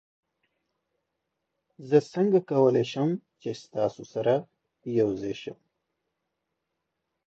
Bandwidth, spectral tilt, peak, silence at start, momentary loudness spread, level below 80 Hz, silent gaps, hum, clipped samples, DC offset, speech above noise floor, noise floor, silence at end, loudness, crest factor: 7.8 kHz; -7.5 dB/octave; -8 dBFS; 1.8 s; 14 LU; -70 dBFS; none; none; under 0.1%; under 0.1%; 56 dB; -82 dBFS; 1.75 s; -27 LUFS; 20 dB